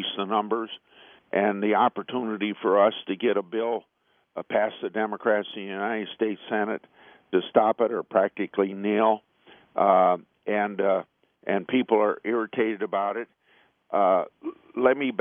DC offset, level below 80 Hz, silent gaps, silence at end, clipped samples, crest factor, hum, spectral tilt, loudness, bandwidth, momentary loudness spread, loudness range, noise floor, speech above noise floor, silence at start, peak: under 0.1%; -76 dBFS; none; 0 s; under 0.1%; 20 dB; none; -9 dB/octave; -25 LUFS; 3.7 kHz; 10 LU; 4 LU; -63 dBFS; 38 dB; 0 s; -6 dBFS